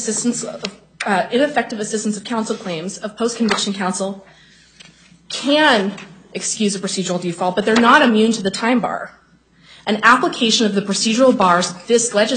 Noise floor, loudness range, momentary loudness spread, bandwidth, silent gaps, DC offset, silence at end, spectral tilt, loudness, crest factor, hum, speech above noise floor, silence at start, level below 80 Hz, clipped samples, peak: -52 dBFS; 6 LU; 14 LU; 9.6 kHz; none; under 0.1%; 0 s; -3.5 dB/octave; -17 LUFS; 18 dB; none; 35 dB; 0 s; -60 dBFS; under 0.1%; 0 dBFS